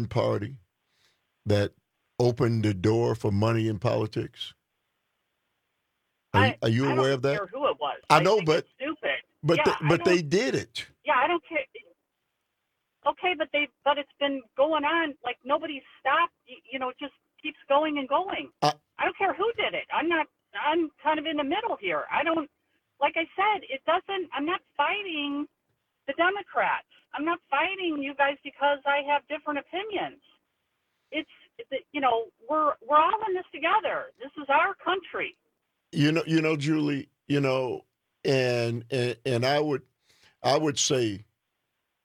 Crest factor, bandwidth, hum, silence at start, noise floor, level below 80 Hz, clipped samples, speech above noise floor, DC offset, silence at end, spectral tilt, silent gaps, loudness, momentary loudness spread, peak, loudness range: 24 dB; 15 kHz; none; 0 s; -80 dBFS; -66 dBFS; under 0.1%; 54 dB; under 0.1%; 0.85 s; -5 dB/octave; none; -27 LUFS; 11 LU; -2 dBFS; 4 LU